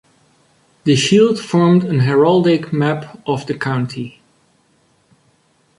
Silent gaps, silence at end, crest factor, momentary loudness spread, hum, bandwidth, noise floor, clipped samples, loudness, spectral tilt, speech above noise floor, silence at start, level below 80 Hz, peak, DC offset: none; 1.7 s; 16 dB; 11 LU; none; 11.5 kHz; -58 dBFS; under 0.1%; -15 LUFS; -6 dB/octave; 43 dB; 0.85 s; -56 dBFS; -2 dBFS; under 0.1%